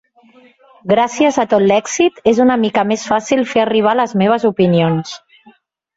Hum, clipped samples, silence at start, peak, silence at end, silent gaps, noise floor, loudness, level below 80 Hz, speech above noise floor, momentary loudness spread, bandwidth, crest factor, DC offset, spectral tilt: none; under 0.1%; 0.85 s; 0 dBFS; 0.8 s; none; -49 dBFS; -14 LUFS; -54 dBFS; 36 dB; 5 LU; 8 kHz; 14 dB; under 0.1%; -5.5 dB/octave